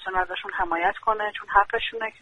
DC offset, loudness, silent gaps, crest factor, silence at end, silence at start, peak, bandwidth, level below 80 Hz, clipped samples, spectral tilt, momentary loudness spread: under 0.1%; -25 LUFS; none; 22 dB; 0.1 s; 0 s; -2 dBFS; 10 kHz; -48 dBFS; under 0.1%; -4.5 dB/octave; 7 LU